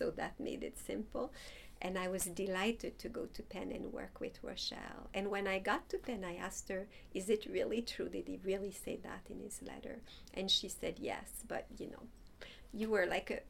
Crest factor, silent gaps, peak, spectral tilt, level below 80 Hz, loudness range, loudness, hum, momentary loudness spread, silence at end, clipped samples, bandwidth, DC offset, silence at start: 22 dB; none; -20 dBFS; -3.5 dB/octave; -60 dBFS; 2 LU; -41 LUFS; none; 14 LU; 0 s; under 0.1%; 17.5 kHz; under 0.1%; 0 s